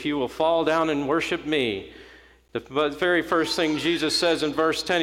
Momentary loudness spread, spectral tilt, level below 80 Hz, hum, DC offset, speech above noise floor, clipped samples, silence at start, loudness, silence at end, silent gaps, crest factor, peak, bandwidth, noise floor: 7 LU; -4 dB/octave; -54 dBFS; none; under 0.1%; 27 dB; under 0.1%; 0 s; -23 LUFS; 0 s; none; 14 dB; -10 dBFS; 16 kHz; -51 dBFS